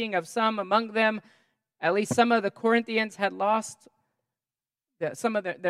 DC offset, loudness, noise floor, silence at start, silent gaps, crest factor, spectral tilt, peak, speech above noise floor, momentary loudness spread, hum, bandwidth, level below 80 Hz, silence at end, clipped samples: under 0.1%; -26 LUFS; under -90 dBFS; 0 s; none; 20 dB; -4 dB/octave; -6 dBFS; over 64 dB; 8 LU; none; 14 kHz; -78 dBFS; 0 s; under 0.1%